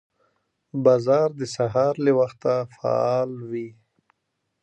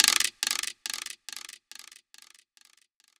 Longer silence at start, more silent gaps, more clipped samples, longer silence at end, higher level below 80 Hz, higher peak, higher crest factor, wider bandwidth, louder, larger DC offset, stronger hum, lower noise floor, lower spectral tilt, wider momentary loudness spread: first, 0.75 s vs 0 s; neither; neither; second, 0.9 s vs 1.35 s; first, -66 dBFS vs -76 dBFS; second, -6 dBFS vs 0 dBFS; second, 18 dB vs 32 dB; second, 9 kHz vs over 20 kHz; first, -22 LUFS vs -29 LUFS; neither; neither; first, -77 dBFS vs -65 dBFS; first, -7 dB/octave vs 3.5 dB/octave; second, 13 LU vs 22 LU